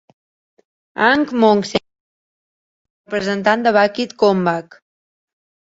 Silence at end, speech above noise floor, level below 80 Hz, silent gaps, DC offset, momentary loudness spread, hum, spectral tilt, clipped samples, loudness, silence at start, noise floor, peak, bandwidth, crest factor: 1.2 s; over 74 dB; -58 dBFS; 2.00-3.05 s; under 0.1%; 10 LU; none; -5.5 dB/octave; under 0.1%; -16 LUFS; 0.95 s; under -90 dBFS; -2 dBFS; 8 kHz; 18 dB